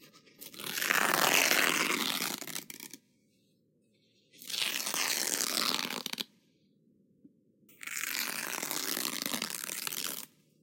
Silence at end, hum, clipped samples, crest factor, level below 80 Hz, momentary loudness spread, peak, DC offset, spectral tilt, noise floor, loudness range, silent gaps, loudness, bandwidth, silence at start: 0.35 s; none; under 0.1%; 28 dB; -86 dBFS; 18 LU; -8 dBFS; under 0.1%; 0 dB/octave; -71 dBFS; 7 LU; none; -31 LUFS; 17 kHz; 0 s